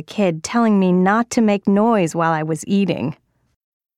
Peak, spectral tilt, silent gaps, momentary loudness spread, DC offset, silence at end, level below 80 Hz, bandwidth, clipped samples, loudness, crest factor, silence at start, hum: -4 dBFS; -6.5 dB/octave; none; 6 LU; under 0.1%; 0.85 s; -60 dBFS; 12.5 kHz; under 0.1%; -17 LUFS; 14 dB; 0 s; none